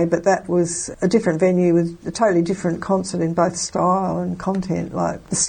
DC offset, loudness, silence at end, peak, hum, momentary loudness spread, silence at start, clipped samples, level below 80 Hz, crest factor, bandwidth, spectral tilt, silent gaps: under 0.1%; -20 LUFS; 0 s; -2 dBFS; none; 7 LU; 0 s; under 0.1%; -50 dBFS; 16 dB; 9.8 kHz; -5.5 dB/octave; none